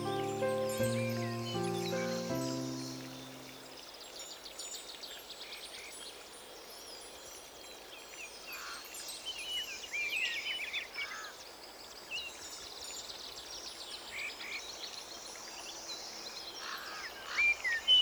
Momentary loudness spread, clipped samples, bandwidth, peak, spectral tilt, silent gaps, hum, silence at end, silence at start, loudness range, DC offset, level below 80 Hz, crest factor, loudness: 14 LU; under 0.1%; over 20 kHz; -18 dBFS; -2.5 dB/octave; none; none; 0 s; 0 s; 9 LU; under 0.1%; -70 dBFS; 20 dB; -38 LUFS